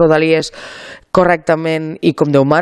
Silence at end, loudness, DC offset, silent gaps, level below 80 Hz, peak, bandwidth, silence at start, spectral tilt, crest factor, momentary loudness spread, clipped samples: 0 s; -14 LUFS; under 0.1%; none; -46 dBFS; 0 dBFS; 12 kHz; 0 s; -6.5 dB/octave; 14 dB; 18 LU; under 0.1%